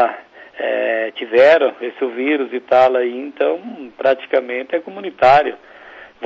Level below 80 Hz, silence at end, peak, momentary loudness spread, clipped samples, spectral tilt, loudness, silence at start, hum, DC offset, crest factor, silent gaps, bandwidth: -58 dBFS; 0 s; -4 dBFS; 13 LU; under 0.1%; -5.5 dB/octave; -16 LUFS; 0 s; none; under 0.1%; 14 dB; none; 7.6 kHz